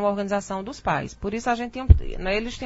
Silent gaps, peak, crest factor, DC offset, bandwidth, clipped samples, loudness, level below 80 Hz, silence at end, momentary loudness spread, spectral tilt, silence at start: none; 0 dBFS; 22 dB; under 0.1%; 8 kHz; under 0.1%; -24 LUFS; -26 dBFS; 0 s; 9 LU; -6.5 dB/octave; 0 s